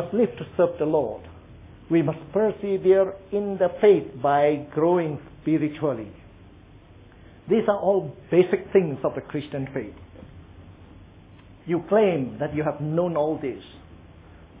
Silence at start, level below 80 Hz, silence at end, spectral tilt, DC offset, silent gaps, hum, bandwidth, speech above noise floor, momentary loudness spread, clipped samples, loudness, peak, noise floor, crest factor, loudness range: 0 s; -54 dBFS; 0 s; -11.5 dB/octave; under 0.1%; none; none; 3.9 kHz; 26 dB; 12 LU; under 0.1%; -24 LUFS; -6 dBFS; -49 dBFS; 18 dB; 6 LU